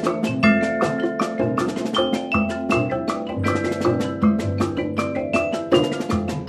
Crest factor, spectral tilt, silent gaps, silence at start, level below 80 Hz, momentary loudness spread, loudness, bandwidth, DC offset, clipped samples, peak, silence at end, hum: 18 dB; -6 dB/octave; none; 0 s; -48 dBFS; 5 LU; -21 LUFS; 13 kHz; under 0.1%; under 0.1%; -4 dBFS; 0 s; none